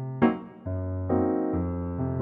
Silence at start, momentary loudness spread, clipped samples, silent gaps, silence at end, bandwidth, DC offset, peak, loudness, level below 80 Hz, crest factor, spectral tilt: 0 s; 9 LU; under 0.1%; none; 0 s; 3.9 kHz; under 0.1%; -8 dBFS; -28 LUFS; -48 dBFS; 20 dB; -12 dB/octave